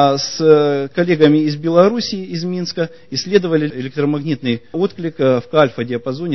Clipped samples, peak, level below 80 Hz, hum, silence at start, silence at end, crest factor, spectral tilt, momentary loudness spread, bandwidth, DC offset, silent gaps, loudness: under 0.1%; 0 dBFS; -56 dBFS; none; 0 s; 0 s; 16 dB; -6 dB/octave; 10 LU; 6.2 kHz; 0.7%; none; -16 LUFS